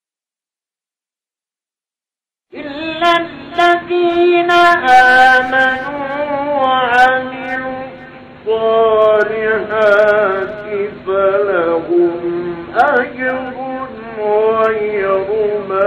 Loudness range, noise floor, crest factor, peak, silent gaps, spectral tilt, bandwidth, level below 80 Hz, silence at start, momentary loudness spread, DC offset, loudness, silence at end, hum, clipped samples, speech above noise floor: 6 LU; under -90 dBFS; 14 dB; 0 dBFS; none; -5 dB/octave; 12.5 kHz; -50 dBFS; 2.55 s; 13 LU; under 0.1%; -13 LUFS; 0 s; none; under 0.1%; over 80 dB